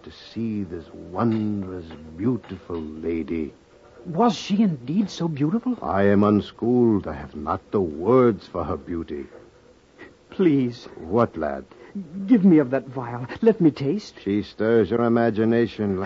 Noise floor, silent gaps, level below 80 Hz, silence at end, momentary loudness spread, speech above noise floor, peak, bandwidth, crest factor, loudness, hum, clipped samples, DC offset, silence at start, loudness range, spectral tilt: -53 dBFS; none; -52 dBFS; 0 s; 16 LU; 31 dB; -6 dBFS; 7.6 kHz; 16 dB; -23 LUFS; none; under 0.1%; under 0.1%; 0.05 s; 6 LU; -8 dB/octave